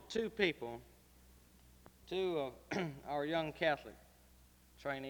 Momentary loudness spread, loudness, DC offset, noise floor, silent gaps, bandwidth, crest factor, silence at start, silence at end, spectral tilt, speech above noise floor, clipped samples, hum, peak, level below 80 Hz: 12 LU; -39 LUFS; under 0.1%; -65 dBFS; none; over 20 kHz; 24 dB; 0 s; 0 s; -5 dB/octave; 26 dB; under 0.1%; none; -16 dBFS; -66 dBFS